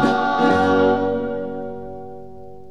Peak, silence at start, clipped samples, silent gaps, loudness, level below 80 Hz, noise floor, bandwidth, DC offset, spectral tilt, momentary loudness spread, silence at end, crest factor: -4 dBFS; 0 s; under 0.1%; none; -19 LUFS; -50 dBFS; -39 dBFS; 10.5 kHz; 1%; -6.5 dB/octave; 21 LU; 0 s; 16 dB